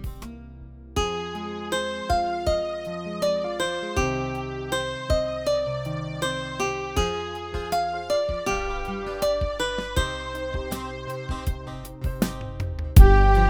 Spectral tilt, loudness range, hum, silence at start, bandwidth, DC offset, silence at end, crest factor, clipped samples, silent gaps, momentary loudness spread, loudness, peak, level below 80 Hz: -5.5 dB/octave; 2 LU; none; 0 s; 19.5 kHz; under 0.1%; 0 s; 24 dB; under 0.1%; none; 8 LU; -26 LUFS; 0 dBFS; -26 dBFS